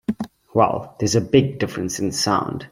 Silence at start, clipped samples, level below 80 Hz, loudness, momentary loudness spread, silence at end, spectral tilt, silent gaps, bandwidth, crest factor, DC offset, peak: 0.1 s; under 0.1%; -52 dBFS; -21 LUFS; 8 LU; 0.05 s; -5 dB/octave; none; 16 kHz; 18 dB; under 0.1%; -2 dBFS